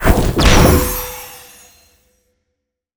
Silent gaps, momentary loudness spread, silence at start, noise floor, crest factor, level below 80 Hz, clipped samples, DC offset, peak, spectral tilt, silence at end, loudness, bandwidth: none; 20 LU; 0 s; -75 dBFS; 16 dB; -20 dBFS; under 0.1%; under 0.1%; 0 dBFS; -4.5 dB/octave; 1.6 s; -13 LUFS; over 20 kHz